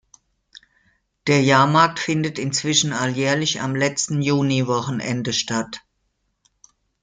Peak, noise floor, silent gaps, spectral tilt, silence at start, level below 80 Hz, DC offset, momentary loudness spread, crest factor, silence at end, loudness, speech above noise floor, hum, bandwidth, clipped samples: -2 dBFS; -71 dBFS; none; -4 dB/octave; 1.25 s; -60 dBFS; under 0.1%; 10 LU; 20 dB; 1.25 s; -20 LUFS; 51 dB; none; 9.6 kHz; under 0.1%